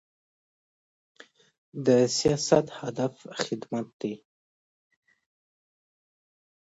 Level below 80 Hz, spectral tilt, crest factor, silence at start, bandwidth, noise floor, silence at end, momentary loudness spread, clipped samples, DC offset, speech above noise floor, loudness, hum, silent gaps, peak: -64 dBFS; -4.5 dB/octave; 24 dB; 1.75 s; 8 kHz; under -90 dBFS; 2.6 s; 14 LU; under 0.1%; under 0.1%; over 64 dB; -27 LUFS; none; 3.93-4.00 s; -6 dBFS